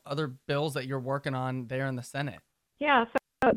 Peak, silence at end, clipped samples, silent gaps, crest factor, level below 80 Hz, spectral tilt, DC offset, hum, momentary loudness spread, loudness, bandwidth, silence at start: -8 dBFS; 0 s; under 0.1%; none; 22 dB; -64 dBFS; -6 dB/octave; under 0.1%; none; 9 LU; -31 LUFS; 16 kHz; 0.05 s